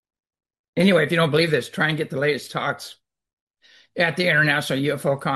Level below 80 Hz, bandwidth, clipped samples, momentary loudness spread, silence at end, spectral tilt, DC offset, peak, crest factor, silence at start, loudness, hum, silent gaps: -64 dBFS; 12.5 kHz; under 0.1%; 10 LU; 0 s; -5.5 dB/octave; under 0.1%; -4 dBFS; 18 dB; 0.75 s; -21 LUFS; none; 3.33-3.47 s